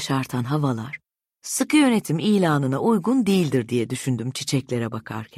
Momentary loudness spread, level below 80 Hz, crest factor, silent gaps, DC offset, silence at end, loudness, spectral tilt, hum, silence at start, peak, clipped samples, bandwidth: 11 LU; -62 dBFS; 14 dB; none; under 0.1%; 0.1 s; -22 LUFS; -5.5 dB/octave; none; 0 s; -8 dBFS; under 0.1%; 15.5 kHz